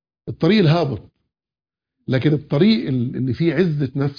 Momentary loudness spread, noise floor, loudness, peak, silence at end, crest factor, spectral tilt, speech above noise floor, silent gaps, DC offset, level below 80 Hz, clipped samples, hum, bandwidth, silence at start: 10 LU; under -90 dBFS; -19 LUFS; -4 dBFS; 0.05 s; 16 dB; -9 dB/octave; over 72 dB; none; under 0.1%; -52 dBFS; under 0.1%; none; 5.2 kHz; 0.25 s